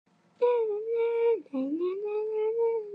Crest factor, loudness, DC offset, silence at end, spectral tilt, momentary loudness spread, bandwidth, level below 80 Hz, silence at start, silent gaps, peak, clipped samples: 14 dB; -29 LUFS; under 0.1%; 0 s; -7 dB/octave; 5 LU; 4.2 kHz; under -90 dBFS; 0.4 s; none; -14 dBFS; under 0.1%